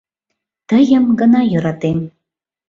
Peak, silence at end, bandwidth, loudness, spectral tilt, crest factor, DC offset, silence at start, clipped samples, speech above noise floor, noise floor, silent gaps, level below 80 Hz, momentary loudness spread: -2 dBFS; 0.6 s; 7.2 kHz; -14 LUFS; -8 dB/octave; 14 dB; under 0.1%; 0.7 s; under 0.1%; 66 dB; -79 dBFS; none; -52 dBFS; 9 LU